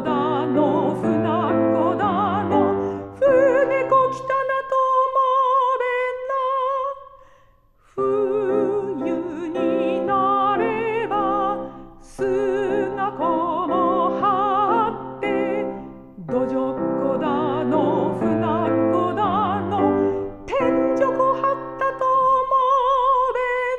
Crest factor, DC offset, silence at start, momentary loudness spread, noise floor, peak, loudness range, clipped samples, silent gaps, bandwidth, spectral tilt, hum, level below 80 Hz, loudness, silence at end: 14 dB; under 0.1%; 0 s; 7 LU; -55 dBFS; -6 dBFS; 4 LU; under 0.1%; none; 9 kHz; -7.5 dB/octave; none; -52 dBFS; -21 LUFS; 0 s